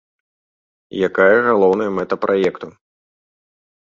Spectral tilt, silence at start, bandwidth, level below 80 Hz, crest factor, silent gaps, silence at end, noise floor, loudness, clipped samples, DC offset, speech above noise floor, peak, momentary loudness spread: -7 dB/octave; 0.95 s; 7.2 kHz; -58 dBFS; 16 dB; none; 1.15 s; under -90 dBFS; -16 LUFS; under 0.1%; under 0.1%; over 74 dB; -2 dBFS; 17 LU